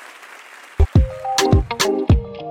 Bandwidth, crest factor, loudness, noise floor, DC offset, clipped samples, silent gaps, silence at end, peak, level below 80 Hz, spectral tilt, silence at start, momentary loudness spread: 16 kHz; 16 dB; -18 LUFS; -41 dBFS; under 0.1%; under 0.1%; none; 0 s; -2 dBFS; -24 dBFS; -5.5 dB/octave; 0 s; 22 LU